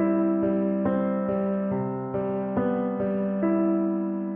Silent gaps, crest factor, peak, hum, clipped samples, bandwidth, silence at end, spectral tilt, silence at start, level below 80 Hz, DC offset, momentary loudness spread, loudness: none; 10 dB; -14 dBFS; none; under 0.1%; 3.4 kHz; 0 s; -10 dB/octave; 0 s; -60 dBFS; under 0.1%; 5 LU; -26 LUFS